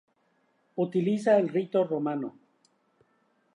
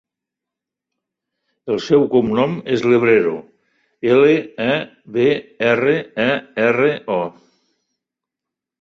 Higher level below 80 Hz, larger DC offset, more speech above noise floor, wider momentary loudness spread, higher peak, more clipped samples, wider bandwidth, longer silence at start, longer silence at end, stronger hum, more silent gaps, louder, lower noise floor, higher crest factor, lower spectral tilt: second, -84 dBFS vs -58 dBFS; neither; second, 44 dB vs 68 dB; first, 13 LU vs 10 LU; second, -12 dBFS vs -2 dBFS; neither; first, 11 kHz vs 7.4 kHz; second, 0.75 s vs 1.65 s; second, 1.25 s vs 1.5 s; neither; neither; second, -27 LUFS vs -17 LUFS; second, -70 dBFS vs -85 dBFS; about the same, 18 dB vs 16 dB; first, -8 dB/octave vs -6.5 dB/octave